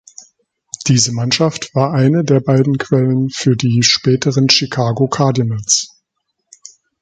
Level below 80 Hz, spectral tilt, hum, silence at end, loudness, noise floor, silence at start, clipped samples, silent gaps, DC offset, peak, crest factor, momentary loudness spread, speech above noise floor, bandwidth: -52 dBFS; -4.5 dB/octave; none; 1.15 s; -14 LUFS; -72 dBFS; 0.8 s; under 0.1%; none; under 0.1%; 0 dBFS; 16 dB; 6 LU; 58 dB; 9.4 kHz